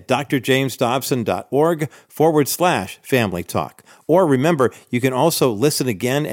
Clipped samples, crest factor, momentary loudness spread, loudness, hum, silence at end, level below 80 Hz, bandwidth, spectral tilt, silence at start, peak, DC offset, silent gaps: under 0.1%; 14 dB; 8 LU; -19 LUFS; none; 0 s; -60 dBFS; 17 kHz; -5 dB/octave; 0.1 s; -4 dBFS; under 0.1%; none